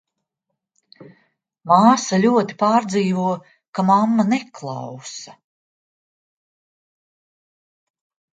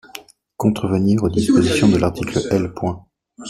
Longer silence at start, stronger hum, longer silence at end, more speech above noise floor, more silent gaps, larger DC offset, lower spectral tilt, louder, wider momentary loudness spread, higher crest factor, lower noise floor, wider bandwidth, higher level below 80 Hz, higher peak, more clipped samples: first, 1 s vs 0.15 s; neither; first, 3.05 s vs 0 s; first, 62 dB vs 24 dB; first, 3.68-3.73 s vs none; neither; about the same, -5.5 dB/octave vs -6.5 dB/octave; about the same, -18 LUFS vs -18 LUFS; first, 18 LU vs 13 LU; about the same, 20 dB vs 16 dB; first, -80 dBFS vs -41 dBFS; second, 9.2 kHz vs 14.5 kHz; second, -70 dBFS vs -44 dBFS; about the same, 0 dBFS vs -2 dBFS; neither